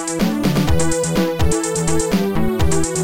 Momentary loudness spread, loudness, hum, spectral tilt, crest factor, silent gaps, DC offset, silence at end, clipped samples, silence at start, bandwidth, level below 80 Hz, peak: 2 LU; -18 LUFS; none; -5 dB/octave; 12 dB; none; under 0.1%; 0 s; under 0.1%; 0 s; 17 kHz; -28 dBFS; -4 dBFS